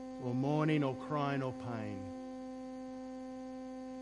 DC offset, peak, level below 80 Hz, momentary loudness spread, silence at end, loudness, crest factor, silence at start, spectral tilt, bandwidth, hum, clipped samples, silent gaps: under 0.1%; -18 dBFS; -68 dBFS; 13 LU; 0 s; -38 LUFS; 20 dB; 0 s; -7.5 dB/octave; 11 kHz; none; under 0.1%; none